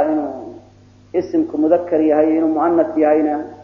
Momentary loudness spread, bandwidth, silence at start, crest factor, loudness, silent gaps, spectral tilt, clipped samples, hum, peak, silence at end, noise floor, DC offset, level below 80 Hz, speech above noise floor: 10 LU; 6 kHz; 0 s; 16 dB; -17 LUFS; none; -8.5 dB/octave; under 0.1%; 50 Hz at -60 dBFS; -2 dBFS; 0 s; -46 dBFS; under 0.1%; -58 dBFS; 31 dB